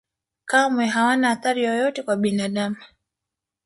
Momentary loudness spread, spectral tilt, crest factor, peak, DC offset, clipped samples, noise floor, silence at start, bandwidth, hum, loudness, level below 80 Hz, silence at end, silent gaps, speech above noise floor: 9 LU; -4.5 dB/octave; 18 dB; -6 dBFS; under 0.1%; under 0.1%; -85 dBFS; 0.45 s; 11.5 kHz; none; -21 LUFS; -68 dBFS; 0.8 s; none; 65 dB